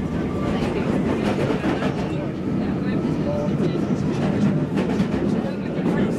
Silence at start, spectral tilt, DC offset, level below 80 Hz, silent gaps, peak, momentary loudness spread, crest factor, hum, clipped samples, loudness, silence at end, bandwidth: 0 s; -8 dB/octave; under 0.1%; -40 dBFS; none; -10 dBFS; 4 LU; 12 dB; none; under 0.1%; -23 LUFS; 0 s; 11.5 kHz